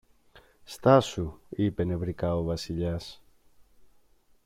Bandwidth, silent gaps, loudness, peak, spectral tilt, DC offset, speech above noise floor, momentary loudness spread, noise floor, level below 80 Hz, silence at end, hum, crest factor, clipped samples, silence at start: 15.5 kHz; none; -28 LUFS; -6 dBFS; -7 dB/octave; under 0.1%; 35 dB; 15 LU; -62 dBFS; -50 dBFS; 1.3 s; none; 24 dB; under 0.1%; 0.7 s